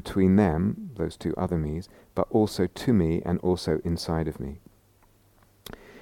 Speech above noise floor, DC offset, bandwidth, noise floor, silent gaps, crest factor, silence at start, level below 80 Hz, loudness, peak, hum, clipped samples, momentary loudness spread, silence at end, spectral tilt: 35 dB; under 0.1%; 16.5 kHz; -60 dBFS; none; 18 dB; 0.05 s; -44 dBFS; -26 LUFS; -8 dBFS; none; under 0.1%; 17 LU; 0 s; -7.5 dB/octave